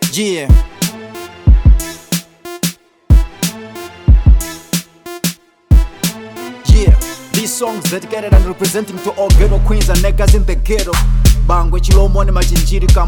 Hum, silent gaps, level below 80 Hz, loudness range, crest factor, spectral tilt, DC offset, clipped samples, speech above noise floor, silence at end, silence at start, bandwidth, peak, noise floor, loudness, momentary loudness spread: none; none; -12 dBFS; 3 LU; 12 dB; -5 dB/octave; under 0.1%; under 0.1%; 20 dB; 0 s; 0 s; 19 kHz; 0 dBFS; -30 dBFS; -14 LUFS; 9 LU